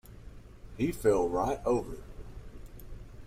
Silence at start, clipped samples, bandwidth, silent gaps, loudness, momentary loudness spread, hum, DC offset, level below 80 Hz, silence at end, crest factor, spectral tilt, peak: 0.05 s; under 0.1%; 16 kHz; none; -30 LUFS; 24 LU; none; under 0.1%; -46 dBFS; 0 s; 20 dB; -6.5 dB/octave; -14 dBFS